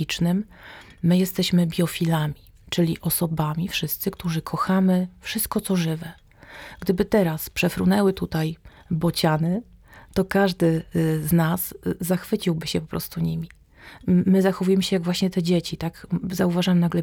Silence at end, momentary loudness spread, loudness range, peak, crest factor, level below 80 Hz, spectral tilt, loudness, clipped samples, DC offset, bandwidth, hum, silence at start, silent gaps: 0 s; 10 LU; 2 LU; -6 dBFS; 16 dB; -48 dBFS; -6 dB/octave; -23 LUFS; under 0.1%; under 0.1%; 19 kHz; none; 0 s; none